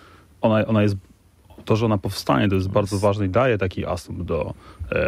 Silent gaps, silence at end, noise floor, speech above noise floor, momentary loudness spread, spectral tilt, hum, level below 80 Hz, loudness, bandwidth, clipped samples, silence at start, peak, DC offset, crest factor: none; 0 s; -50 dBFS; 29 dB; 9 LU; -7 dB/octave; none; -44 dBFS; -22 LUFS; 15 kHz; under 0.1%; 0.4 s; -4 dBFS; under 0.1%; 18 dB